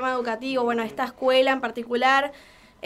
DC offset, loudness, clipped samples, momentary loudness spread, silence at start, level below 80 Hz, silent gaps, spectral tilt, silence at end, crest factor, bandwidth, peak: under 0.1%; -23 LUFS; under 0.1%; 8 LU; 0 s; -62 dBFS; none; -3.5 dB/octave; 0.5 s; 18 dB; 13.5 kHz; -6 dBFS